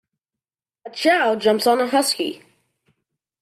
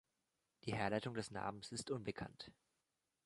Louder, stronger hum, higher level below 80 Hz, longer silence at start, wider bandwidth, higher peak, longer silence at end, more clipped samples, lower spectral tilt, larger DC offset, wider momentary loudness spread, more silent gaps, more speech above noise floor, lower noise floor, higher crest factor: first, -19 LUFS vs -45 LUFS; neither; about the same, -70 dBFS vs -72 dBFS; first, 0.85 s vs 0.65 s; first, 15.5 kHz vs 11.5 kHz; first, -4 dBFS vs -22 dBFS; first, 1.05 s vs 0.75 s; neither; second, -2.5 dB/octave vs -5 dB/octave; neither; about the same, 13 LU vs 11 LU; neither; first, 71 dB vs 44 dB; about the same, -90 dBFS vs -89 dBFS; second, 18 dB vs 24 dB